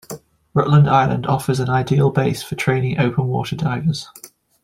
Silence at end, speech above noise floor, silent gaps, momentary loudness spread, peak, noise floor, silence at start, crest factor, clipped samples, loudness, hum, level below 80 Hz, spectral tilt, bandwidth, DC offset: 0.35 s; 20 dB; none; 9 LU; -2 dBFS; -37 dBFS; 0.1 s; 16 dB; under 0.1%; -18 LUFS; none; -48 dBFS; -7 dB/octave; 15.5 kHz; under 0.1%